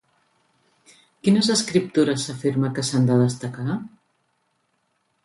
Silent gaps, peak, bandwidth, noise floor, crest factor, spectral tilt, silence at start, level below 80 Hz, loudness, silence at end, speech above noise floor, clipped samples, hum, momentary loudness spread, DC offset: none; -6 dBFS; 11.5 kHz; -70 dBFS; 18 dB; -5.5 dB/octave; 1.25 s; -64 dBFS; -22 LUFS; 1.4 s; 49 dB; under 0.1%; none; 10 LU; under 0.1%